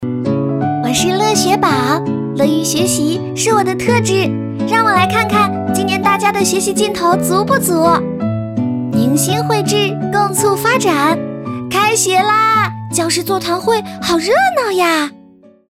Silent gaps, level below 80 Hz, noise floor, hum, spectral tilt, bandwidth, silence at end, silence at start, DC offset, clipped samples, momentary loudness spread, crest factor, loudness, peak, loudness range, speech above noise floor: none; -48 dBFS; -43 dBFS; none; -4 dB/octave; 17 kHz; 0.6 s; 0 s; under 0.1%; under 0.1%; 6 LU; 14 dB; -14 LUFS; 0 dBFS; 1 LU; 30 dB